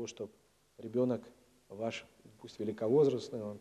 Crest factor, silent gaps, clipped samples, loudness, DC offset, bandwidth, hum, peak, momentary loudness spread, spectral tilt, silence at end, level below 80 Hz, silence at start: 18 dB; none; under 0.1%; -35 LUFS; under 0.1%; 12 kHz; none; -18 dBFS; 22 LU; -6.5 dB/octave; 0 s; -76 dBFS; 0 s